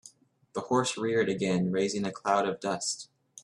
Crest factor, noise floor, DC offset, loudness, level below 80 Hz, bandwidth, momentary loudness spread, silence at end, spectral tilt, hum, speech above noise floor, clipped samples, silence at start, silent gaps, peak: 20 dB; -57 dBFS; under 0.1%; -29 LUFS; -68 dBFS; 12 kHz; 11 LU; 0.05 s; -4.5 dB/octave; none; 28 dB; under 0.1%; 0.05 s; none; -10 dBFS